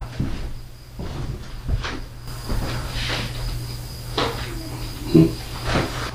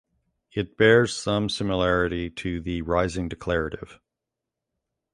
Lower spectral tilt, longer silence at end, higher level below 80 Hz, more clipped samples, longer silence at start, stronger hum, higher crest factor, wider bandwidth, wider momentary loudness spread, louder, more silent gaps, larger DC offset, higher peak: about the same, -5.5 dB/octave vs -5.5 dB/octave; second, 0 s vs 1.2 s; first, -32 dBFS vs -44 dBFS; neither; second, 0 s vs 0.55 s; neither; about the same, 24 dB vs 22 dB; first, 16.5 kHz vs 11 kHz; about the same, 16 LU vs 14 LU; about the same, -25 LUFS vs -24 LUFS; neither; neither; first, 0 dBFS vs -4 dBFS